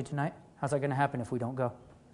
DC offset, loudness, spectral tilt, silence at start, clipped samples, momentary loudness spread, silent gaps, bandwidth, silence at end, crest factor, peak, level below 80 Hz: under 0.1%; -33 LUFS; -7 dB/octave; 0 s; under 0.1%; 6 LU; none; 11 kHz; 0.15 s; 20 dB; -14 dBFS; -66 dBFS